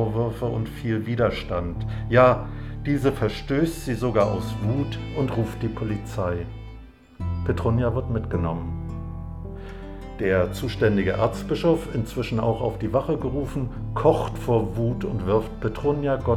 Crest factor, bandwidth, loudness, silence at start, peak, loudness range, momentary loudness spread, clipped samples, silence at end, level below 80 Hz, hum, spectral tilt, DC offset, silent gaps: 20 dB; 14.5 kHz; -25 LUFS; 0 s; -4 dBFS; 5 LU; 12 LU; under 0.1%; 0 s; -38 dBFS; none; -7.5 dB/octave; under 0.1%; none